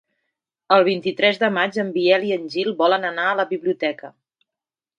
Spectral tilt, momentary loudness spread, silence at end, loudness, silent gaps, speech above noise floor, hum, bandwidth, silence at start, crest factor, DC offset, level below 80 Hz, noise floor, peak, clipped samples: -5.5 dB/octave; 7 LU; 0.9 s; -20 LUFS; none; 69 dB; none; 9 kHz; 0.7 s; 20 dB; under 0.1%; -72 dBFS; -88 dBFS; 0 dBFS; under 0.1%